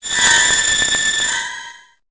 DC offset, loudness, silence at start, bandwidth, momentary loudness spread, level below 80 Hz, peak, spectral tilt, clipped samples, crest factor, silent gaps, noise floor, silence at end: under 0.1%; -13 LUFS; 0.05 s; 8 kHz; 13 LU; -46 dBFS; 0 dBFS; 1.5 dB/octave; under 0.1%; 16 dB; none; -38 dBFS; 0.35 s